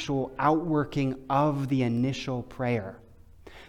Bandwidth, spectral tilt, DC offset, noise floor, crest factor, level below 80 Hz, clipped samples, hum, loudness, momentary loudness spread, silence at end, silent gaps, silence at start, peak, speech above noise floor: 12.5 kHz; -7 dB/octave; under 0.1%; -50 dBFS; 18 dB; -54 dBFS; under 0.1%; none; -28 LUFS; 7 LU; 0 s; none; 0 s; -10 dBFS; 23 dB